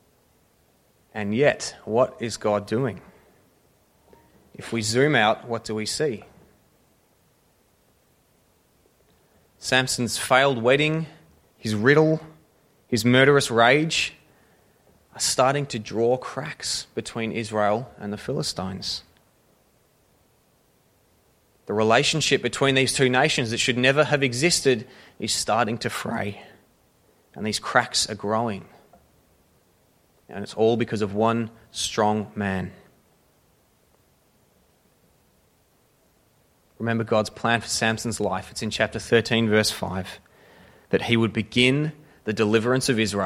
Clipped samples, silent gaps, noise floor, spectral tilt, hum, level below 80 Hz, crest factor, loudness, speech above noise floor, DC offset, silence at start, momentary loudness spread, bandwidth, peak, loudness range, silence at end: under 0.1%; none; -63 dBFS; -4 dB/octave; none; -58 dBFS; 22 dB; -23 LUFS; 40 dB; under 0.1%; 1.15 s; 13 LU; 16 kHz; -2 dBFS; 9 LU; 0 s